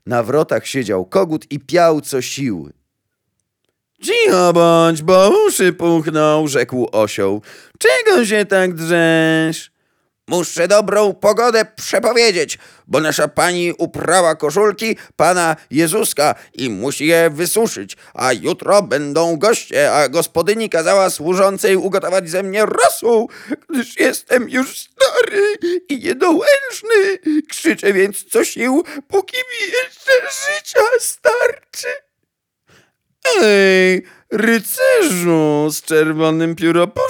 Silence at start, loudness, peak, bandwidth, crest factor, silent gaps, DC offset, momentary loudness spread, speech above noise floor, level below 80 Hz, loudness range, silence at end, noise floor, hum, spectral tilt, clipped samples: 0.05 s; -15 LUFS; 0 dBFS; over 20 kHz; 16 dB; none; under 0.1%; 9 LU; 59 dB; -60 dBFS; 3 LU; 0 s; -74 dBFS; none; -4 dB/octave; under 0.1%